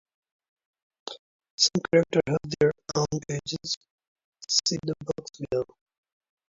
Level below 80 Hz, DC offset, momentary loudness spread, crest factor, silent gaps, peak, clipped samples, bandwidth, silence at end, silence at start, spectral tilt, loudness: -60 dBFS; under 0.1%; 18 LU; 22 dB; 1.19-1.39 s, 1.50-1.58 s, 3.77-3.81 s, 3.91-3.98 s, 4.07-4.16 s, 4.24-4.33 s; -8 dBFS; under 0.1%; 7.8 kHz; 0.85 s; 1.05 s; -3.5 dB/octave; -26 LUFS